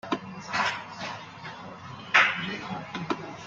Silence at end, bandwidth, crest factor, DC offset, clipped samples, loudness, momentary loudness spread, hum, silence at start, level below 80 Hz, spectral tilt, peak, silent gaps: 0 s; 9.2 kHz; 26 dB; under 0.1%; under 0.1%; -27 LUFS; 20 LU; none; 0.05 s; -66 dBFS; -3.5 dB/octave; -4 dBFS; none